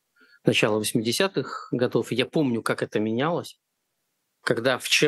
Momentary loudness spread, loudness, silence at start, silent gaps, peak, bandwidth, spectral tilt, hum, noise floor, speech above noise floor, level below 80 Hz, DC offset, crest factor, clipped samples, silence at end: 9 LU; -25 LUFS; 0.45 s; none; -4 dBFS; 13 kHz; -4 dB/octave; none; -77 dBFS; 53 dB; -74 dBFS; under 0.1%; 20 dB; under 0.1%; 0 s